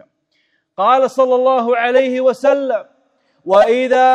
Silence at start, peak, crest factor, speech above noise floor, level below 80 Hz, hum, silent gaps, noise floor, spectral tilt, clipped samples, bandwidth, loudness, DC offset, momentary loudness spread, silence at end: 0.8 s; 0 dBFS; 14 dB; 51 dB; -64 dBFS; none; none; -63 dBFS; -4.5 dB/octave; under 0.1%; 9.4 kHz; -14 LUFS; under 0.1%; 9 LU; 0 s